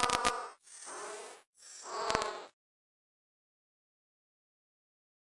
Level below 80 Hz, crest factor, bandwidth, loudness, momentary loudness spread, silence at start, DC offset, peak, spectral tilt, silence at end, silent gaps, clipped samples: -64 dBFS; 34 dB; 11.5 kHz; -37 LUFS; 19 LU; 0 s; under 0.1%; -8 dBFS; -1.5 dB/octave; 2.85 s; 1.47-1.53 s; under 0.1%